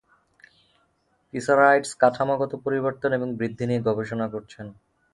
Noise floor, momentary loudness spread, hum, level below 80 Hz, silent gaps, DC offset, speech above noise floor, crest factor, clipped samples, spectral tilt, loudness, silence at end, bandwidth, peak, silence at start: -68 dBFS; 18 LU; none; -62 dBFS; none; under 0.1%; 45 dB; 20 dB; under 0.1%; -6 dB/octave; -23 LUFS; 0.4 s; 11.5 kHz; -4 dBFS; 1.35 s